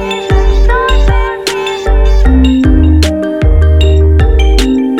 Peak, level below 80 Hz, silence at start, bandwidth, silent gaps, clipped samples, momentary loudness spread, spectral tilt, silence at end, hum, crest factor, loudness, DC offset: 0 dBFS; -8 dBFS; 0 s; 12 kHz; none; under 0.1%; 5 LU; -6.5 dB/octave; 0 s; none; 8 dB; -10 LUFS; under 0.1%